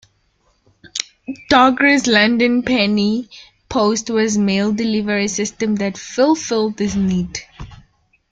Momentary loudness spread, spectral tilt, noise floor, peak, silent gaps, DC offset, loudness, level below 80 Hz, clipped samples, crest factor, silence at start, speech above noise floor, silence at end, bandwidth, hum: 13 LU; -4 dB/octave; -61 dBFS; 0 dBFS; none; under 0.1%; -17 LUFS; -48 dBFS; under 0.1%; 18 dB; 0.85 s; 45 dB; 0.55 s; 9.2 kHz; none